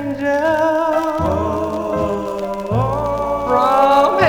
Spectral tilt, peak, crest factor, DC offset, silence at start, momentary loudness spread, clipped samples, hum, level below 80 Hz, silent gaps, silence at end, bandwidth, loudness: -6.5 dB/octave; -2 dBFS; 16 dB; 0.2%; 0 s; 8 LU; under 0.1%; none; -38 dBFS; none; 0 s; 18.5 kHz; -17 LUFS